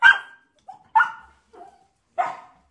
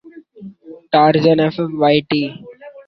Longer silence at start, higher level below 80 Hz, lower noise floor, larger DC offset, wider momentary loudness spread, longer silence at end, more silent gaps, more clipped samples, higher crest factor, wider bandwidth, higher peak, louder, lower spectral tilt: about the same, 0 s vs 0.05 s; second, -68 dBFS vs -56 dBFS; first, -57 dBFS vs -38 dBFS; neither; first, 24 LU vs 16 LU; first, 0.35 s vs 0.05 s; neither; neither; first, 22 dB vs 16 dB; first, 10.5 kHz vs 6 kHz; about the same, 0 dBFS vs -2 dBFS; second, -22 LUFS vs -15 LUFS; second, -0.5 dB/octave vs -8 dB/octave